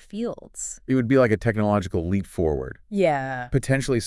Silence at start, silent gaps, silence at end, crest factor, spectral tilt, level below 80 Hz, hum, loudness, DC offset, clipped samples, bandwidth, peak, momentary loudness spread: 0.15 s; none; 0 s; 18 dB; -6.5 dB/octave; -42 dBFS; none; -24 LUFS; under 0.1%; under 0.1%; 12 kHz; -6 dBFS; 12 LU